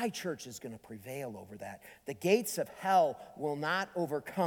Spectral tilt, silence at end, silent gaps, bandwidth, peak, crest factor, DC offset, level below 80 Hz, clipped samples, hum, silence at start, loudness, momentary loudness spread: -4.5 dB/octave; 0 s; none; 19 kHz; -14 dBFS; 20 dB; under 0.1%; -74 dBFS; under 0.1%; none; 0 s; -34 LUFS; 18 LU